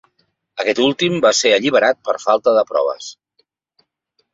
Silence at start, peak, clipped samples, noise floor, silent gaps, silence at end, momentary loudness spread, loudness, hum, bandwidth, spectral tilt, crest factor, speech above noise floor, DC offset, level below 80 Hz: 0.55 s; -2 dBFS; under 0.1%; -68 dBFS; none; 1.2 s; 11 LU; -16 LUFS; none; 8 kHz; -3 dB/octave; 16 dB; 52 dB; under 0.1%; -62 dBFS